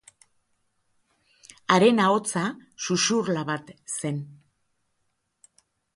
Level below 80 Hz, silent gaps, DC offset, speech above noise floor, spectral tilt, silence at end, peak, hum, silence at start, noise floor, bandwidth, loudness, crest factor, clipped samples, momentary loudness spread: -70 dBFS; none; under 0.1%; 51 dB; -4 dB/octave; 1.65 s; -2 dBFS; none; 1.7 s; -75 dBFS; 11.5 kHz; -24 LUFS; 24 dB; under 0.1%; 15 LU